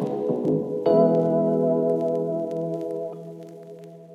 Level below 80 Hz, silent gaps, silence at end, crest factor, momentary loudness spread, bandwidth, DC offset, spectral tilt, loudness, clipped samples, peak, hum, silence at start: -74 dBFS; none; 0 s; 16 dB; 22 LU; 8.6 kHz; under 0.1%; -10 dB/octave; -23 LUFS; under 0.1%; -8 dBFS; none; 0 s